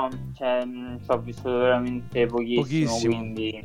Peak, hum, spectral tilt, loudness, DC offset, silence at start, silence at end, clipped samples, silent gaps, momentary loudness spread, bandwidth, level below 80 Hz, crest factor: -10 dBFS; none; -6 dB/octave; -25 LUFS; under 0.1%; 0 s; 0 s; under 0.1%; none; 8 LU; 12 kHz; -52 dBFS; 16 dB